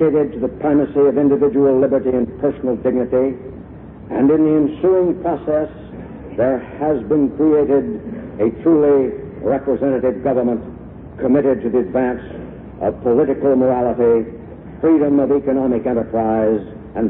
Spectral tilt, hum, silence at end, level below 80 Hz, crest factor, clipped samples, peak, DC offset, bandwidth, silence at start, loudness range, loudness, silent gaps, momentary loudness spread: -13 dB/octave; none; 0 s; -44 dBFS; 12 dB; under 0.1%; -4 dBFS; under 0.1%; 3.7 kHz; 0 s; 2 LU; -17 LUFS; none; 16 LU